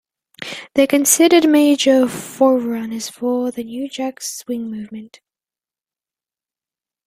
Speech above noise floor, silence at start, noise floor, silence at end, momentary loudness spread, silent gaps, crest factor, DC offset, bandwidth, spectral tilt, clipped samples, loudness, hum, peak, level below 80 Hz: over 74 dB; 0.4 s; under -90 dBFS; 2 s; 18 LU; none; 18 dB; under 0.1%; 16 kHz; -2.5 dB/octave; under 0.1%; -16 LUFS; none; 0 dBFS; -64 dBFS